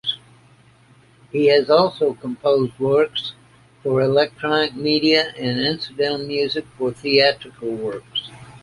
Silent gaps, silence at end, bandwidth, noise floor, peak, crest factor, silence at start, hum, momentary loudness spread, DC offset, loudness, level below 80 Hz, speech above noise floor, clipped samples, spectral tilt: none; 0.05 s; 11.5 kHz; -52 dBFS; -2 dBFS; 18 dB; 0.05 s; none; 12 LU; under 0.1%; -20 LUFS; -58 dBFS; 33 dB; under 0.1%; -6 dB/octave